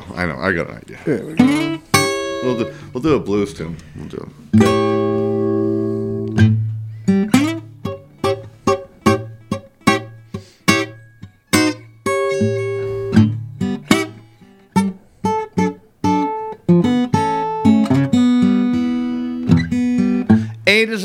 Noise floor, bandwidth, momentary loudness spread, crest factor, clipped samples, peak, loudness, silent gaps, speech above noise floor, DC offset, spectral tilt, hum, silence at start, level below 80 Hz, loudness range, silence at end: -46 dBFS; 17 kHz; 13 LU; 18 dB; under 0.1%; 0 dBFS; -18 LUFS; none; 28 dB; under 0.1%; -6 dB/octave; none; 0 s; -48 dBFS; 4 LU; 0 s